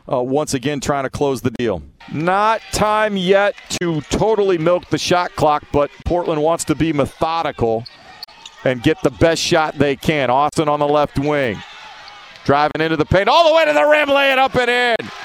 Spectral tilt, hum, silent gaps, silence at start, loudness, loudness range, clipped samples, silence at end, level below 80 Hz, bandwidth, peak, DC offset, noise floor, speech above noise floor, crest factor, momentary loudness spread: -4.5 dB/octave; none; none; 0.05 s; -17 LUFS; 4 LU; under 0.1%; 0 s; -40 dBFS; 16 kHz; 0 dBFS; under 0.1%; -38 dBFS; 22 dB; 16 dB; 10 LU